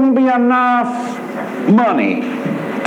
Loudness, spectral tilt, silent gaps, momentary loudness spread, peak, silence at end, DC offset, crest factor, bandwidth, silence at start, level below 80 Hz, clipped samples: -15 LUFS; -7 dB/octave; none; 11 LU; -2 dBFS; 0 s; under 0.1%; 12 dB; 10.5 kHz; 0 s; -68 dBFS; under 0.1%